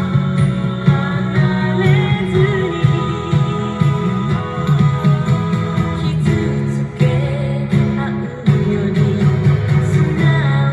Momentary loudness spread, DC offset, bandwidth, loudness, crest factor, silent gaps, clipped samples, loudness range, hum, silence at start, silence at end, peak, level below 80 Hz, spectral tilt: 5 LU; under 0.1%; 9.8 kHz; -16 LUFS; 14 dB; none; under 0.1%; 1 LU; none; 0 s; 0 s; 0 dBFS; -38 dBFS; -8 dB/octave